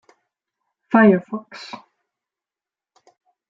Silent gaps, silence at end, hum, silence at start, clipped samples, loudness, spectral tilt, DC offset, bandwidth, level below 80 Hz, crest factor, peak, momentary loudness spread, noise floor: none; 1.75 s; none; 0.9 s; under 0.1%; -16 LUFS; -8 dB/octave; under 0.1%; 7.2 kHz; -68 dBFS; 20 dB; -2 dBFS; 23 LU; under -90 dBFS